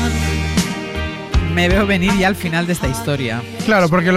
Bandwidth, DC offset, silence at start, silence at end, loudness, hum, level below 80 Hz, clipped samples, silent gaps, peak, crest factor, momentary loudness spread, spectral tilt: 16 kHz; under 0.1%; 0 s; 0 s; -17 LUFS; none; -26 dBFS; under 0.1%; none; -4 dBFS; 12 dB; 8 LU; -5.5 dB/octave